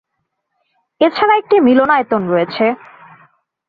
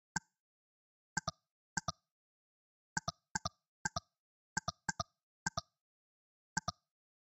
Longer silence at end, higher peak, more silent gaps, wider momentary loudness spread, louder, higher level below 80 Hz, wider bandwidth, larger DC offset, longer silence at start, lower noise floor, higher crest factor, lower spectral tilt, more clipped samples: first, 0.95 s vs 0.55 s; first, -2 dBFS vs -18 dBFS; second, none vs 0.40-1.16 s, 1.51-1.76 s, 2.11-2.96 s, 3.31-3.35 s, 3.68-3.85 s, 4.19-4.56 s, 5.23-5.46 s, 5.81-6.56 s; about the same, 7 LU vs 5 LU; first, -13 LUFS vs -43 LUFS; first, -58 dBFS vs -66 dBFS; second, 5 kHz vs 16.5 kHz; neither; first, 1 s vs 0.15 s; second, -72 dBFS vs under -90 dBFS; second, 14 dB vs 28 dB; first, -8.5 dB/octave vs -2.5 dB/octave; neither